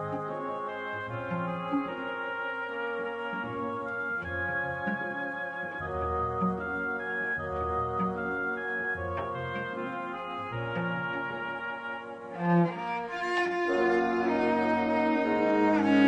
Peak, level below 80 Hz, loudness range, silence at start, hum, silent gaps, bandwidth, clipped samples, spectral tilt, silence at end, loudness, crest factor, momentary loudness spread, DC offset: -12 dBFS; -54 dBFS; 6 LU; 0 s; none; none; 9.6 kHz; under 0.1%; -7.5 dB/octave; 0 s; -31 LUFS; 18 dB; 9 LU; under 0.1%